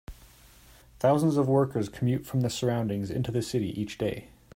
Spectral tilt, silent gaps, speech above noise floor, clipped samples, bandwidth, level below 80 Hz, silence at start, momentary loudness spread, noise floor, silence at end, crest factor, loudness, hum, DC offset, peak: -7 dB/octave; none; 28 dB; under 0.1%; 16 kHz; -54 dBFS; 0.1 s; 8 LU; -55 dBFS; 0.3 s; 18 dB; -28 LUFS; none; under 0.1%; -12 dBFS